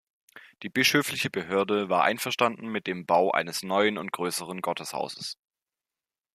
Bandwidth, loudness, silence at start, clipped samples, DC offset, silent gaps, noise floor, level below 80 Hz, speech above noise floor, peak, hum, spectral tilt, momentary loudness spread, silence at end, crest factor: 15 kHz; -27 LUFS; 0.35 s; under 0.1%; under 0.1%; none; under -90 dBFS; -74 dBFS; over 63 dB; -6 dBFS; none; -3.5 dB/octave; 11 LU; 1 s; 22 dB